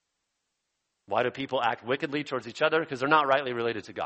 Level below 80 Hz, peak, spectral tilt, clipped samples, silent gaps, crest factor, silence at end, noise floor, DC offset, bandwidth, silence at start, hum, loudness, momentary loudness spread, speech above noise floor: -74 dBFS; -6 dBFS; -5 dB/octave; under 0.1%; none; 22 dB; 0 s; -81 dBFS; under 0.1%; 8.4 kHz; 1.1 s; none; -28 LUFS; 9 LU; 53 dB